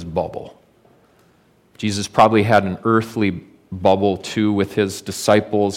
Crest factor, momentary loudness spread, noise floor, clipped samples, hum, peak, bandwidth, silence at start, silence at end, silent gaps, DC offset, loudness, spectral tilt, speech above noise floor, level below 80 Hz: 18 dB; 12 LU; -56 dBFS; under 0.1%; none; -2 dBFS; 16.5 kHz; 0 s; 0 s; none; under 0.1%; -18 LUFS; -5.5 dB/octave; 38 dB; -52 dBFS